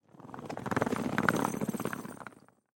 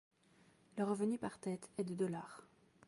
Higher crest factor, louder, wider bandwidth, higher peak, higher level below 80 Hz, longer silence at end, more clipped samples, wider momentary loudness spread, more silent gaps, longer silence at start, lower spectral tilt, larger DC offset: first, 28 dB vs 16 dB; first, -33 LUFS vs -42 LUFS; first, 17 kHz vs 11.5 kHz; first, -6 dBFS vs -26 dBFS; first, -64 dBFS vs -80 dBFS; about the same, 0.4 s vs 0.4 s; neither; first, 18 LU vs 14 LU; neither; second, 0.15 s vs 0.75 s; second, -5.5 dB/octave vs -7 dB/octave; neither